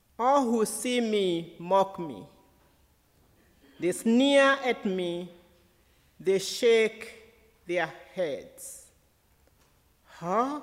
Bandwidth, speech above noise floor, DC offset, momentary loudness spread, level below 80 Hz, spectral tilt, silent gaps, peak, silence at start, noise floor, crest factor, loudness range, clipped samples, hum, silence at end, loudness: 16 kHz; 39 dB; under 0.1%; 20 LU; -68 dBFS; -4 dB/octave; none; -12 dBFS; 0.2 s; -65 dBFS; 18 dB; 8 LU; under 0.1%; none; 0 s; -27 LUFS